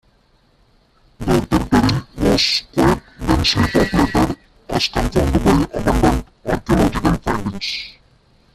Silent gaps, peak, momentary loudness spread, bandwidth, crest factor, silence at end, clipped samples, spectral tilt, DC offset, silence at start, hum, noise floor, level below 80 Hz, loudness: none; -2 dBFS; 9 LU; 14.5 kHz; 16 dB; 0.65 s; under 0.1%; -5.5 dB/octave; under 0.1%; 1.2 s; none; -56 dBFS; -28 dBFS; -17 LUFS